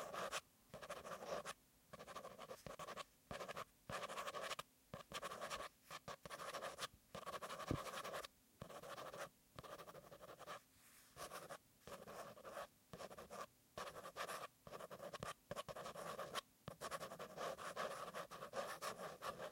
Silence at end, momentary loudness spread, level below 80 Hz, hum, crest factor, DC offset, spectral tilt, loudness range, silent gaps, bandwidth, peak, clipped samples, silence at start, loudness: 0 s; 10 LU; -74 dBFS; none; 24 dB; under 0.1%; -3 dB/octave; 6 LU; none; 16.5 kHz; -28 dBFS; under 0.1%; 0 s; -52 LUFS